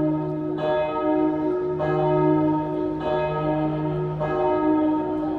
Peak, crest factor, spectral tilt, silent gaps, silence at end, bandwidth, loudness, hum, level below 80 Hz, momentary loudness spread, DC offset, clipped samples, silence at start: -8 dBFS; 14 dB; -10 dB/octave; none; 0 s; 4.7 kHz; -23 LUFS; none; -48 dBFS; 6 LU; under 0.1%; under 0.1%; 0 s